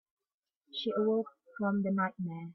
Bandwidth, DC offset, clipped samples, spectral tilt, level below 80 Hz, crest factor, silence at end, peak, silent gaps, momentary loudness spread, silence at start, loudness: 6 kHz; under 0.1%; under 0.1%; -8.5 dB/octave; -80 dBFS; 14 dB; 0 s; -20 dBFS; none; 10 LU; 0.75 s; -33 LUFS